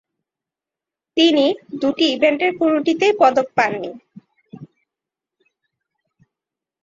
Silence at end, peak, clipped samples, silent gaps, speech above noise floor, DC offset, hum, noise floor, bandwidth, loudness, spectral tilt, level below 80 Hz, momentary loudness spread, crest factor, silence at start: 2.2 s; -2 dBFS; under 0.1%; none; 71 dB; under 0.1%; none; -87 dBFS; 7.6 kHz; -17 LUFS; -4 dB/octave; -66 dBFS; 8 LU; 18 dB; 1.15 s